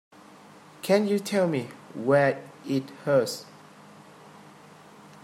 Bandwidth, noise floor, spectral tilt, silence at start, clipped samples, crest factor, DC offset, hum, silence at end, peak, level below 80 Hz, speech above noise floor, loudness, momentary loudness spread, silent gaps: 16 kHz; -50 dBFS; -5.5 dB/octave; 0.85 s; under 0.1%; 20 dB; under 0.1%; none; 1.8 s; -8 dBFS; -74 dBFS; 26 dB; -26 LUFS; 15 LU; none